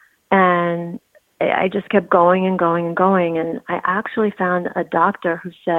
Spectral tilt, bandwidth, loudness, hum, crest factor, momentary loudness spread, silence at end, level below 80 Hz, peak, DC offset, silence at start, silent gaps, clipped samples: -8.5 dB/octave; 4.1 kHz; -18 LUFS; none; 16 dB; 9 LU; 0 s; -62 dBFS; -2 dBFS; under 0.1%; 0.3 s; none; under 0.1%